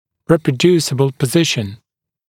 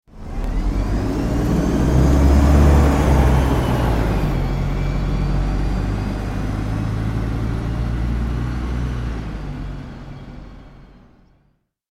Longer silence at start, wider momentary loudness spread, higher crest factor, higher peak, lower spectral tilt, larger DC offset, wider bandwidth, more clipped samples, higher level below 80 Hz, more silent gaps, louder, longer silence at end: first, 0.3 s vs 0.15 s; second, 6 LU vs 16 LU; about the same, 16 dB vs 16 dB; about the same, 0 dBFS vs -2 dBFS; second, -5 dB/octave vs -7.5 dB/octave; neither; first, 17 kHz vs 15 kHz; neither; second, -54 dBFS vs -22 dBFS; neither; first, -15 LUFS vs -20 LUFS; second, 0.55 s vs 1.15 s